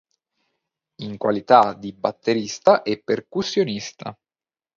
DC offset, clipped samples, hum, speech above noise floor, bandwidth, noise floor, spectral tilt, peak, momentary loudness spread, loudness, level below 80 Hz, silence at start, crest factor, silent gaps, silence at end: under 0.1%; under 0.1%; none; over 69 dB; 7.6 kHz; under -90 dBFS; -5 dB/octave; 0 dBFS; 18 LU; -21 LUFS; -64 dBFS; 1 s; 22 dB; none; 0.65 s